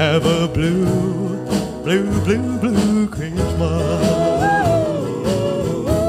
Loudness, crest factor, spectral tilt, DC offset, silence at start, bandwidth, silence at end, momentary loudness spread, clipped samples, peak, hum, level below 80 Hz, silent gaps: -18 LUFS; 16 dB; -6.5 dB/octave; under 0.1%; 0 s; 15.5 kHz; 0 s; 5 LU; under 0.1%; -2 dBFS; none; -34 dBFS; none